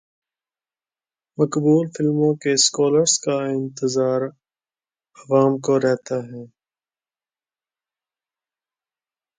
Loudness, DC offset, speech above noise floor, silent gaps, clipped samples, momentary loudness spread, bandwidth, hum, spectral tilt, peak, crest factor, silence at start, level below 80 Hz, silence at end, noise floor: -19 LUFS; under 0.1%; over 71 dB; none; under 0.1%; 12 LU; 9.6 kHz; none; -4.5 dB/octave; -4 dBFS; 18 dB; 1.4 s; -70 dBFS; 2.95 s; under -90 dBFS